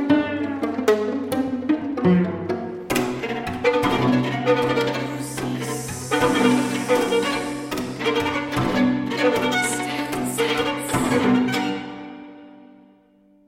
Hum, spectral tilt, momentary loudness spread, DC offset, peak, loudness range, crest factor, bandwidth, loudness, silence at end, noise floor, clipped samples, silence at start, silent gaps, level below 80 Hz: none; -5 dB/octave; 9 LU; under 0.1%; -4 dBFS; 2 LU; 18 dB; 16.5 kHz; -22 LUFS; 0.85 s; -56 dBFS; under 0.1%; 0 s; none; -50 dBFS